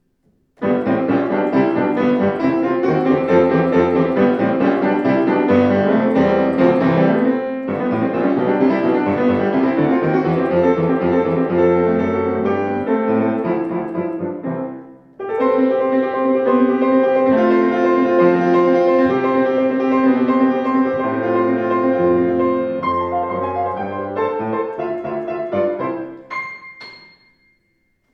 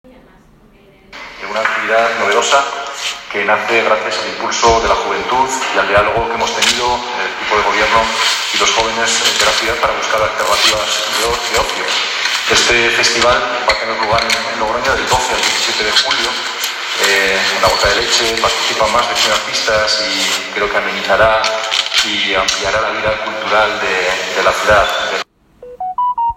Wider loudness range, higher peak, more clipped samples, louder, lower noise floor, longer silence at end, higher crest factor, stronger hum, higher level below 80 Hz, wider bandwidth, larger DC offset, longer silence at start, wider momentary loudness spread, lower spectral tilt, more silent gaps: first, 6 LU vs 2 LU; about the same, 0 dBFS vs 0 dBFS; neither; second, -17 LUFS vs -13 LUFS; first, -65 dBFS vs -45 dBFS; first, 1.15 s vs 0 s; about the same, 16 dB vs 14 dB; neither; second, -54 dBFS vs -38 dBFS; second, 6.2 kHz vs 17 kHz; neither; second, 0.6 s vs 1.1 s; about the same, 9 LU vs 7 LU; first, -9 dB/octave vs -1 dB/octave; neither